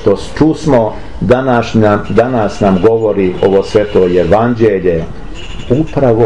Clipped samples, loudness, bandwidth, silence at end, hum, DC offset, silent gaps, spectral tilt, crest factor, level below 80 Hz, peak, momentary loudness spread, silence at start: under 0.1%; -11 LUFS; 10.5 kHz; 0 s; none; 4%; none; -7.5 dB/octave; 10 dB; -30 dBFS; 0 dBFS; 8 LU; 0 s